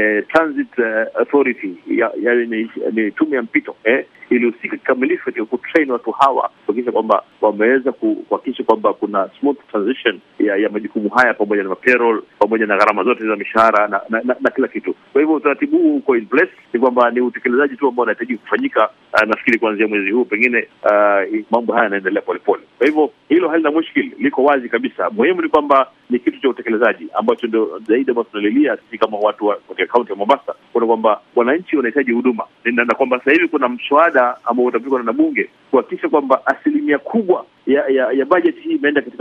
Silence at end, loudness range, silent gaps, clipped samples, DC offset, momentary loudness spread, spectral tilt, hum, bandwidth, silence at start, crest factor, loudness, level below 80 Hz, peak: 0.05 s; 2 LU; none; under 0.1%; under 0.1%; 6 LU; -6.5 dB/octave; none; 7.8 kHz; 0 s; 16 dB; -16 LUFS; -64 dBFS; 0 dBFS